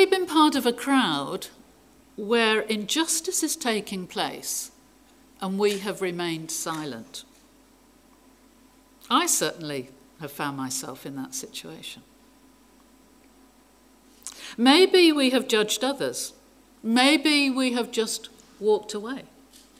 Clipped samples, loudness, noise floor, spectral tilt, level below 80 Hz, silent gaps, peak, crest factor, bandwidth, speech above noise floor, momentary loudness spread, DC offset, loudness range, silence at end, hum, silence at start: under 0.1%; -24 LUFS; -57 dBFS; -2.5 dB/octave; -66 dBFS; none; -4 dBFS; 22 dB; 16 kHz; 33 dB; 20 LU; under 0.1%; 13 LU; 0.55 s; none; 0 s